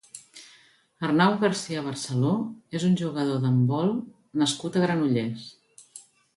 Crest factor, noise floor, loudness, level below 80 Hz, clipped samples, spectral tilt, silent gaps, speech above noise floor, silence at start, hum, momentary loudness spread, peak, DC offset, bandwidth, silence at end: 18 dB; -58 dBFS; -26 LUFS; -68 dBFS; under 0.1%; -6 dB/octave; none; 34 dB; 0.15 s; none; 22 LU; -8 dBFS; under 0.1%; 11.5 kHz; 0.35 s